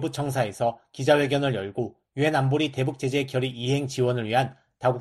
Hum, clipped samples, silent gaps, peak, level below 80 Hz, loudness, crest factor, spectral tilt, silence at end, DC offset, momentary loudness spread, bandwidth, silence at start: none; under 0.1%; none; -6 dBFS; -62 dBFS; -25 LUFS; 18 dB; -6 dB/octave; 0 s; under 0.1%; 7 LU; 13 kHz; 0 s